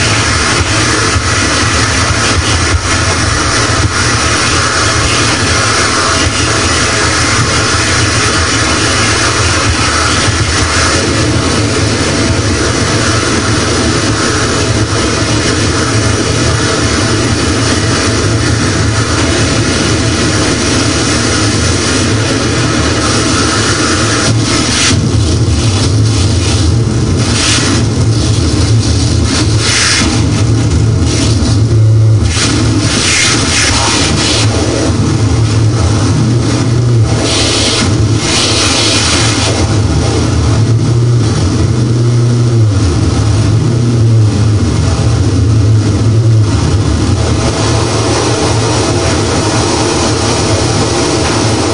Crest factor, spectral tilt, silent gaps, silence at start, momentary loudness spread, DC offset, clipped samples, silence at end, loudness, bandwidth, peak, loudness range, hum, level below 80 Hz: 10 dB; -4 dB/octave; none; 0 s; 3 LU; 2%; under 0.1%; 0 s; -10 LUFS; 10.5 kHz; 0 dBFS; 2 LU; none; -24 dBFS